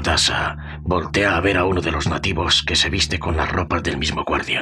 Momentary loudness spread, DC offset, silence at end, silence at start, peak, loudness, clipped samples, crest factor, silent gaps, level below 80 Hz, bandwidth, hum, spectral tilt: 6 LU; under 0.1%; 0 s; 0 s; -6 dBFS; -19 LUFS; under 0.1%; 14 dB; none; -34 dBFS; 12.5 kHz; none; -3.5 dB/octave